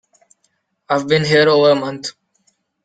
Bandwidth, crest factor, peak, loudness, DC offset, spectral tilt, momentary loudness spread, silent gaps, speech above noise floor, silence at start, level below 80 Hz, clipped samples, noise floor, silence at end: 9.2 kHz; 16 dB; -2 dBFS; -15 LUFS; under 0.1%; -5 dB/octave; 15 LU; none; 52 dB; 0.9 s; -58 dBFS; under 0.1%; -66 dBFS; 0.75 s